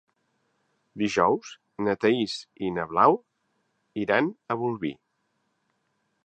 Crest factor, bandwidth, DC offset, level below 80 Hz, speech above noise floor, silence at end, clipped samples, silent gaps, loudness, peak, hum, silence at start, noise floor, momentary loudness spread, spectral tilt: 22 dB; 9.2 kHz; under 0.1%; -64 dBFS; 50 dB; 1.3 s; under 0.1%; none; -26 LUFS; -6 dBFS; none; 0.95 s; -75 dBFS; 11 LU; -5.5 dB/octave